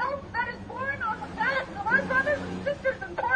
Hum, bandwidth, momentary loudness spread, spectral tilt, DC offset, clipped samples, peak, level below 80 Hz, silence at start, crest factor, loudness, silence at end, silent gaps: none; 10 kHz; 8 LU; -5.5 dB/octave; under 0.1%; under 0.1%; -12 dBFS; -52 dBFS; 0 s; 16 dB; -28 LUFS; 0 s; none